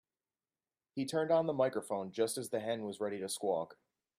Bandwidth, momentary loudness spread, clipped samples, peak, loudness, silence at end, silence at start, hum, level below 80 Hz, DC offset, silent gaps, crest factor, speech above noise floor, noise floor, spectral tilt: 15.5 kHz; 8 LU; under 0.1%; -18 dBFS; -36 LUFS; 0.45 s; 0.95 s; none; -82 dBFS; under 0.1%; none; 18 dB; over 55 dB; under -90 dBFS; -4.5 dB/octave